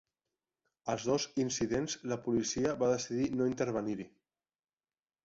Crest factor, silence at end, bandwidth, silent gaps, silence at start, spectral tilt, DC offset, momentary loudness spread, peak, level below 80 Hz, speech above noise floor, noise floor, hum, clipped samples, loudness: 16 dB; 1.15 s; 8 kHz; none; 0.85 s; -4.5 dB/octave; under 0.1%; 8 LU; -18 dBFS; -64 dBFS; over 57 dB; under -90 dBFS; none; under 0.1%; -34 LUFS